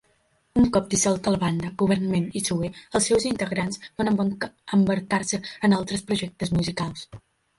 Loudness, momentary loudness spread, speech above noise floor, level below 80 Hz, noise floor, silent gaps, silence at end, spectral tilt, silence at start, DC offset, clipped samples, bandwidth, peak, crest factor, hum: -24 LUFS; 7 LU; 42 dB; -50 dBFS; -66 dBFS; none; 0.4 s; -5 dB/octave; 0.55 s; under 0.1%; under 0.1%; 11.5 kHz; -8 dBFS; 16 dB; none